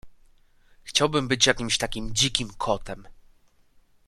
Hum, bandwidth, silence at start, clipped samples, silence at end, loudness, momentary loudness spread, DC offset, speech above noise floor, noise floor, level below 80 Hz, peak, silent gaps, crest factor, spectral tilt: none; 14 kHz; 0.05 s; under 0.1%; 0.9 s; -24 LUFS; 9 LU; under 0.1%; 34 dB; -60 dBFS; -46 dBFS; -2 dBFS; none; 26 dB; -2.5 dB/octave